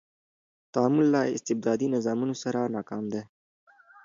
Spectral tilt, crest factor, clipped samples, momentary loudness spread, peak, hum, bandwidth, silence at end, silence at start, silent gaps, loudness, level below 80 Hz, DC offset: -6 dB/octave; 18 dB; under 0.1%; 11 LU; -10 dBFS; none; 7.6 kHz; 0.8 s; 0.75 s; none; -27 LUFS; -74 dBFS; under 0.1%